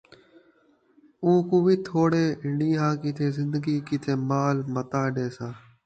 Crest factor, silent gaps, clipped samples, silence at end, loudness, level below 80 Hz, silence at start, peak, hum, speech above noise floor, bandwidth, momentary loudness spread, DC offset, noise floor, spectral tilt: 16 dB; none; under 0.1%; 0.25 s; -25 LUFS; -64 dBFS; 1.2 s; -10 dBFS; none; 38 dB; 8.8 kHz; 7 LU; under 0.1%; -62 dBFS; -8 dB/octave